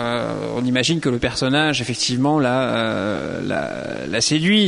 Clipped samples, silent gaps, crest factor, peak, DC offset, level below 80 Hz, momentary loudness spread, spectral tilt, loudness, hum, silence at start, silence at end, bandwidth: under 0.1%; none; 14 dB; -6 dBFS; under 0.1%; -48 dBFS; 7 LU; -4 dB/octave; -20 LUFS; none; 0 s; 0 s; 11 kHz